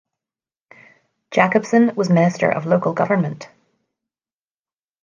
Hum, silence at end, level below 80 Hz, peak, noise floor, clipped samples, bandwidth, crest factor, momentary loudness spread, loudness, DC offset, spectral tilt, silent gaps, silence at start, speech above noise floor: none; 1.55 s; -66 dBFS; -2 dBFS; under -90 dBFS; under 0.1%; 7.4 kHz; 18 dB; 7 LU; -18 LUFS; under 0.1%; -7 dB/octave; none; 1.3 s; over 73 dB